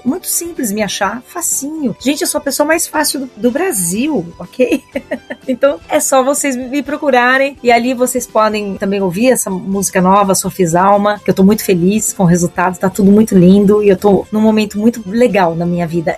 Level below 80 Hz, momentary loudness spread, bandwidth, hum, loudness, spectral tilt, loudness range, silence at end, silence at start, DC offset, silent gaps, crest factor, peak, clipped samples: -44 dBFS; 8 LU; 15 kHz; none; -13 LUFS; -5 dB/octave; 5 LU; 0 s; 0.05 s; under 0.1%; none; 12 dB; 0 dBFS; 0.2%